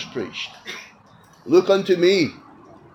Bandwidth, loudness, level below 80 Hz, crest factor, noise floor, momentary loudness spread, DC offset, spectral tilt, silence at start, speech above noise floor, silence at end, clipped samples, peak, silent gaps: 8 kHz; -20 LUFS; -66 dBFS; 18 dB; -51 dBFS; 18 LU; under 0.1%; -5.5 dB/octave; 0 s; 32 dB; 0.6 s; under 0.1%; -4 dBFS; none